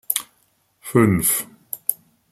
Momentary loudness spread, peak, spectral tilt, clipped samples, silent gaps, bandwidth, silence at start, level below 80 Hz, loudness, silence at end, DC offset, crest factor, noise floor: 18 LU; 0 dBFS; -4.5 dB/octave; under 0.1%; none; 16.5 kHz; 0.1 s; -52 dBFS; -20 LUFS; 0.4 s; under 0.1%; 22 dB; -64 dBFS